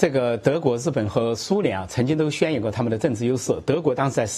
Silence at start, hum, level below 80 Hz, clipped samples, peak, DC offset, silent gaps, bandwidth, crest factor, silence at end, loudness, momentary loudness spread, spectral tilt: 0 s; none; -54 dBFS; under 0.1%; -2 dBFS; under 0.1%; none; 13 kHz; 20 dB; 0 s; -23 LUFS; 3 LU; -6 dB/octave